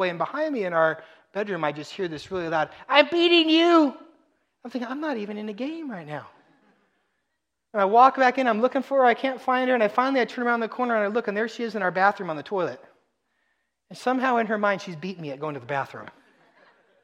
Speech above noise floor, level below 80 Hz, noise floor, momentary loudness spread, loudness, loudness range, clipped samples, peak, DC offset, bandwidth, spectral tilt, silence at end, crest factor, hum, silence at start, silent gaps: 57 dB; -72 dBFS; -80 dBFS; 16 LU; -23 LUFS; 7 LU; under 0.1%; -2 dBFS; under 0.1%; 10 kHz; -5 dB/octave; 0.95 s; 24 dB; none; 0 s; none